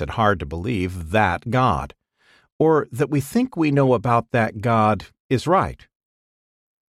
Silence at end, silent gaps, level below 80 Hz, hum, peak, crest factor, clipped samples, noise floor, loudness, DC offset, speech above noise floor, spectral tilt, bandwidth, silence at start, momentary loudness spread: 1.2 s; 2.52-2.59 s, 5.20-5.29 s; -44 dBFS; none; -4 dBFS; 18 dB; under 0.1%; -59 dBFS; -21 LUFS; under 0.1%; 39 dB; -7 dB/octave; 15 kHz; 0 s; 7 LU